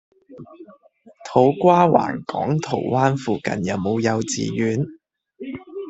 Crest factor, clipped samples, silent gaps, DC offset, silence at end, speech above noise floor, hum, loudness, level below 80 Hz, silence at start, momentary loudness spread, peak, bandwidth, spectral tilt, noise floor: 20 dB; under 0.1%; none; under 0.1%; 0 s; 23 dB; none; -20 LUFS; -58 dBFS; 0.3 s; 18 LU; -2 dBFS; 8.4 kHz; -6 dB/octave; -42 dBFS